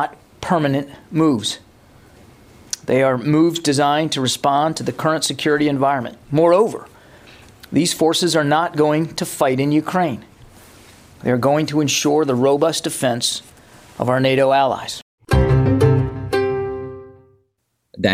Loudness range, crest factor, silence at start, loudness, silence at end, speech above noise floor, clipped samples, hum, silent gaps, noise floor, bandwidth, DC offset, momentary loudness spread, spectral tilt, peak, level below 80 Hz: 2 LU; 16 dB; 0 s; -18 LUFS; 0 s; 53 dB; under 0.1%; none; 15.02-15.18 s; -70 dBFS; 16 kHz; under 0.1%; 11 LU; -5 dB/octave; -2 dBFS; -38 dBFS